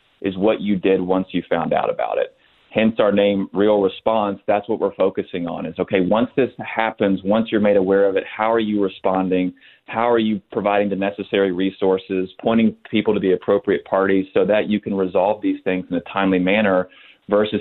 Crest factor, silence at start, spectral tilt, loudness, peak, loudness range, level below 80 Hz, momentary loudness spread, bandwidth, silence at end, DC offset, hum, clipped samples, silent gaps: 18 dB; 0.2 s; -10.5 dB/octave; -19 LUFS; 0 dBFS; 2 LU; -56 dBFS; 6 LU; 4.2 kHz; 0 s; under 0.1%; none; under 0.1%; none